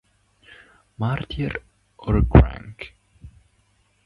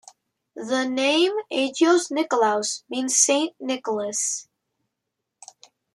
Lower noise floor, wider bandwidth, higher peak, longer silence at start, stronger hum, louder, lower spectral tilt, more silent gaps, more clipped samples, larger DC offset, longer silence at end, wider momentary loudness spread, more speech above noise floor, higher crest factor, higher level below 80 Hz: second, -63 dBFS vs -82 dBFS; second, 5.2 kHz vs 12.5 kHz; first, 0 dBFS vs -4 dBFS; first, 1 s vs 0.55 s; first, 50 Hz at -50 dBFS vs none; about the same, -21 LUFS vs -22 LUFS; first, -9.5 dB/octave vs -1 dB/octave; neither; neither; neither; second, 0.8 s vs 1.5 s; first, 22 LU vs 9 LU; second, 44 dB vs 59 dB; about the same, 24 dB vs 20 dB; first, -28 dBFS vs -80 dBFS